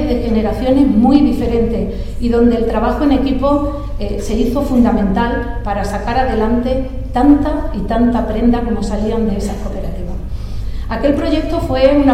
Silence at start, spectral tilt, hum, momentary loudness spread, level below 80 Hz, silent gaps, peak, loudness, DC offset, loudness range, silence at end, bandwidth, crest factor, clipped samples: 0 s; -7.5 dB/octave; none; 12 LU; -22 dBFS; none; 0 dBFS; -15 LUFS; under 0.1%; 4 LU; 0 s; 14 kHz; 14 dB; under 0.1%